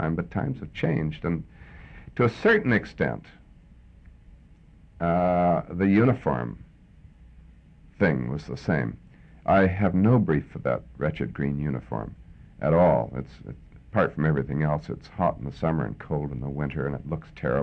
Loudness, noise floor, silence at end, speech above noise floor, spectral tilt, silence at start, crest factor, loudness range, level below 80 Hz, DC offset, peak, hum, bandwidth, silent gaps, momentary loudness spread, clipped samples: -26 LUFS; -52 dBFS; 0 s; 27 dB; -9.5 dB/octave; 0 s; 18 dB; 3 LU; -46 dBFS; under 0.1%; -8 dBFS; none; 6.6 kHz; none; 15 LU; under 0.1%